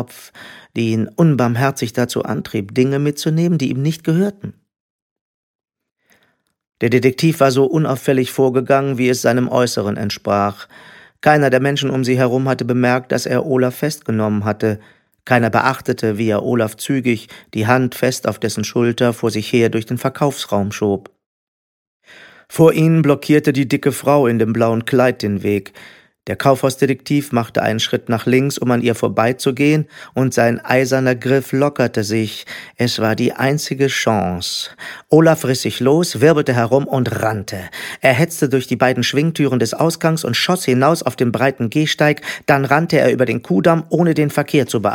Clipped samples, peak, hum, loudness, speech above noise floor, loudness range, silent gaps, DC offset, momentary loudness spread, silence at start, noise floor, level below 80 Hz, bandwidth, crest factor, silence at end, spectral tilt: under 0.1%; 0 dBFS; none; -16 LUFS; 46 dB; 3 LU; 4.80-5.59 s, 21.26-22.00 s; under 0.1%; 7 LU; 0 s; -62 dBFS; -56 dBFS; 17.5 kHz; 16 dB; 0 s; -5.5 dB/octave